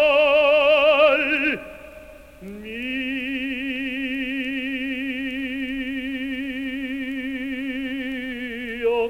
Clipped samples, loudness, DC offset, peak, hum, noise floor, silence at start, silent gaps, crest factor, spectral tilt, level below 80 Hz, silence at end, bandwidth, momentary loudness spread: under 0.1%; -22 LUFS; 0.1%; -6 dBFS; none; -43 dBFS; 0 s; none; 18 dB; -4.5 dB/octave; -50 dBFS; 0 s; 16 kHz; 14 LU